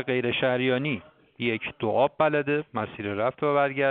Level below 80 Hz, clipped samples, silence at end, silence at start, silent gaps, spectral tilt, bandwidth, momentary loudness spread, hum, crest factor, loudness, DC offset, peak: -64 dBFS; under 0.1%; 0 s; 0 s; none; -4 dB/octave; 4.6 kHz; 8 LU; none; 18 dB; -26 LUFS; under 0.1%; -8 dBFS